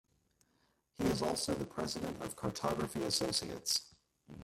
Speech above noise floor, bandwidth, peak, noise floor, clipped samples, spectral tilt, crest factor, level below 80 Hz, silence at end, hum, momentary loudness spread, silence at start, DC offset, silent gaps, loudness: 39 dB; 16 kHz; -20 dBFS; -76 dBFS; under 0.1%; -3.5 dB/octave; 20 dB; -62 dBFS; 0 s; none; 7 LU; 1 s; under 0.1%; none; -36 LUFS